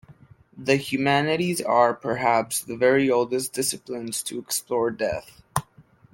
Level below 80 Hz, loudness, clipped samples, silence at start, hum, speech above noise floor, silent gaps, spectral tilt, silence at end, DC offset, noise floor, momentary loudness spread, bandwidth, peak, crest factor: -60 dBFS; -24 LUFS; under 0.1%; 0.1 s; none; 31 dB; none; -4 dB/octave; 0.5 s; under 0.1%; -55 dBFS; 11 LU; 17 kHz; -4 dBFS; 20 dB